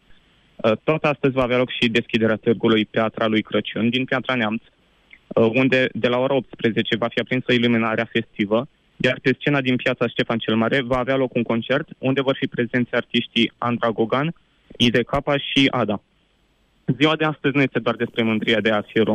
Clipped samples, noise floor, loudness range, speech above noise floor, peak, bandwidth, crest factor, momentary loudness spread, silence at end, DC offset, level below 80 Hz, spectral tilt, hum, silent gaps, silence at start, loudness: under 0.1%; -62 dBFS; 2 LU; 42 dB; -4 dBFS; 9.6 kHz; 18 dB; 5 LU; 0 s; under 0.1%; -52 dBFS; -6.5 dB/octave; none; none; 0.6 s; -21 LUFS